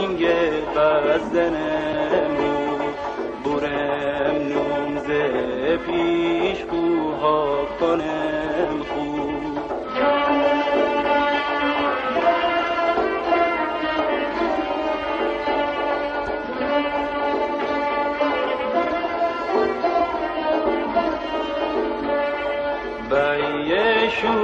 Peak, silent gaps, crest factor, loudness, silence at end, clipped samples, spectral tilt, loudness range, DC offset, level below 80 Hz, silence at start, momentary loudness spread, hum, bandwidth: -6 dBFS; none; 14 dB; -22 LUFS; 0 s; under 0.1%; -6 dB/octave; 3 LU; under 0.1%; -48 dBFS; 0 s; 6 LU; none; 8.2 kHz